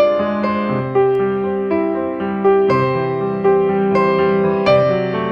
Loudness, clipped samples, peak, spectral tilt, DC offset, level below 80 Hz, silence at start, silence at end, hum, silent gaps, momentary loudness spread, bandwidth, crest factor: -16 LUFS; under 0.1%; -2 dBFS; -8.5 dB/octave; under 0.1%; -50 dBFS; 0 s; 0 s; none; none; 5 LU; 5.8 kHz; 12 dB